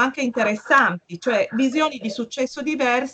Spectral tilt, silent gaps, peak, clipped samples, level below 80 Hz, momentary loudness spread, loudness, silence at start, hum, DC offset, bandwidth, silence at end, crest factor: -4 dB/octave; none; -4 dBFS; under 0.1%; -68 dBFS; 10 LU; -21 LUFS; 0 s; none; under 0.1%; 8.6 kHz; 0 s; 16 dB